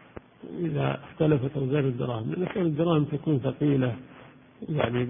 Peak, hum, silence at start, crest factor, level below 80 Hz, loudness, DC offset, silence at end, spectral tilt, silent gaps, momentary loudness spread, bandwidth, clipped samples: -8 dBFS; none; 0.15 s; 18 dB; -56 dBFS; -27 LUFS; under 0.1%; 0 s; -12 dB/octave; none; 9 LU; 3.7 kHz; under 0.1%